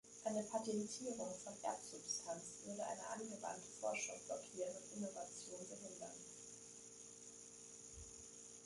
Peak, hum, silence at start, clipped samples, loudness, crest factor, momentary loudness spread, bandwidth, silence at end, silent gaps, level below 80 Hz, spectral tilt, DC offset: -28 dBFS; none; 0.05 s; under 0.1%; -48 LUFS; 20 dB; 12 LU; 11.5 kHz; 0 s; none; -78 dBFS; -3 dB/octave; under 0.1%